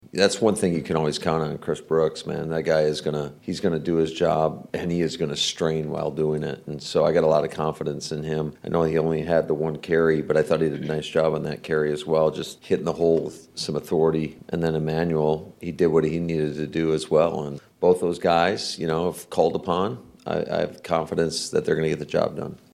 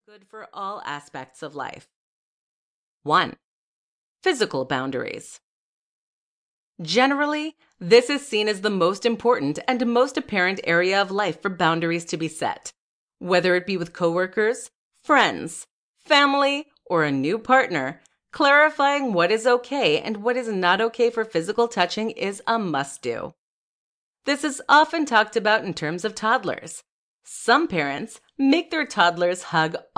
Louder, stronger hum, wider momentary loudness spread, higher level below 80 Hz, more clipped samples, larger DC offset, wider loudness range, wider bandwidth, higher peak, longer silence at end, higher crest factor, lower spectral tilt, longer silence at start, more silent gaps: about the same, -24 LUFS vs -22 LUFS; neither; second, 8 LU vs 16 LU; first, -56 dBFS vs -68 dBFS; neither; neither; second, 2 LU vs 7 LU; first, 14 kHz vs 10.5 kHz; about the same, -4 dBFS vs -4 dBFS; about the same, 0.2 s vs 0.15 s; about the same, 18 dB vs 20 dB; first, -5.5 dB/octave vs -4 dB/octave; second, 0.15 s vs 0.35 s; second, none vs 1.96-3.00 s, 3.44-4.16 s, 5.43-6.75 s, 12.78-13.08 s, 14.75-14.91 s, 15.70-15.94 s, 23.38-24.14 s, 26.89-27.20 s